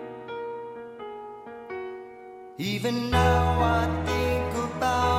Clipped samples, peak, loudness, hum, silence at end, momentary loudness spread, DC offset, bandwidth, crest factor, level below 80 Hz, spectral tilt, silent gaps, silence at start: under 0.1%; -8 dBFS; -26 LUFS; none; 0 s; 19 LU; under 0.1%; 16 kHz; 18 dB; -38 dBFS; -6 dB/octave; none; 0 s